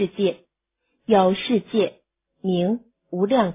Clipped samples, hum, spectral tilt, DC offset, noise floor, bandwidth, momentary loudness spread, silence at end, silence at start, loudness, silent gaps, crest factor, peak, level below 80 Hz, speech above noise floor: under 0.1%; none; -11 dB/octave; under 0.1%; -76 dBFS; 3.9 kHz; 13 LU; 0 s; 0 s; -22 LUFS; none; 18 dB; -4 dBFS; -62 dBFS; 55 dB